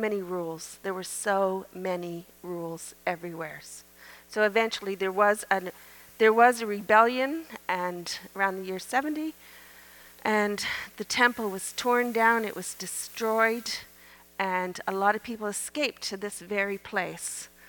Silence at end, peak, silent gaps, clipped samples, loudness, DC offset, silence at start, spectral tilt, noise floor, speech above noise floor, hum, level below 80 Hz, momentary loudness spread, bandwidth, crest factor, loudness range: 0 s; -6 dBFS; none; under 0.1%; -28 LUFS; under 0.1%; 0 s; -3 dB/octave; -54 dBFS; 26 dB; none; -68 dBFS; 14 LU; over 20 kHz; 22 dB; 7 LU